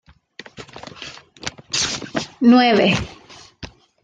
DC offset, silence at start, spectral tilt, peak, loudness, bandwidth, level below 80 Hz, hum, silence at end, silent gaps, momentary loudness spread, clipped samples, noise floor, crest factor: under 0.1%; 0.6 s; -4 dB/octave; -2 dBFS; -17 LUFS; 9.2 kHz; -48 dBFS; none; 0.4 s; none; 25 LU; under 0.1%; -43 dBFS; 18 dB